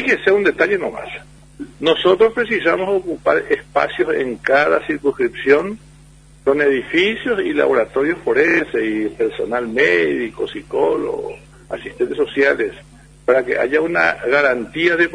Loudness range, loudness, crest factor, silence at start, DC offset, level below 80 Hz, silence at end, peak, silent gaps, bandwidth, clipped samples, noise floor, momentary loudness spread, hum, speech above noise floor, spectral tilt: 3 LU; -17 LUFS; 18 dB; 0 s; under 0.1%; -48 dBFS; 0 s; 0 dBFS; none; 10.5 kHz; under 0.1%; -45 dBFS; 11 LU; none; 28 dB; -5.5 dB/octave